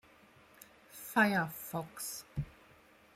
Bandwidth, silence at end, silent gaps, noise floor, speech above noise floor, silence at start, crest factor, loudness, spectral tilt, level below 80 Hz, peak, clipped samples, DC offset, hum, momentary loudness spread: 16 kHz; 0.65 s; none; -62 dBFS; 28 dB; 0.9 s; 24 dB; -35 LUFS; -4.5 dB/octave; -60 dBFS; -14 dBFS; under 0.1%; under 0.1%; none; 19 LU